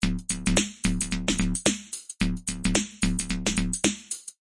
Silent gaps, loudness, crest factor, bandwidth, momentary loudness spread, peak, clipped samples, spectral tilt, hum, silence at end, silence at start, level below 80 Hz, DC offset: none; -27 LUFS; 26 dB; 11.5 kHz; 5 LU; -2 dBFS; under 0.1%; -3.5 dB/octave; none; 0.1 s; 0 s; -34 dBFS; under 0.1%